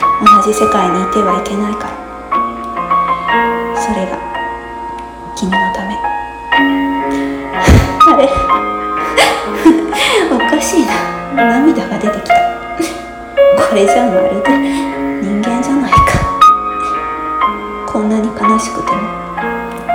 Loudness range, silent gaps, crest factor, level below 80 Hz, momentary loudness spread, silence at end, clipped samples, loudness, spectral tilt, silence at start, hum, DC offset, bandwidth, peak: 6 LU; none; 12 dB; -28 dBFS; 12 LU; 0 s; 0.4%; -12 LUFS; -5 dB/octave; 0 s; none; under 0.1%; 17.5 kHz; 0 dBFS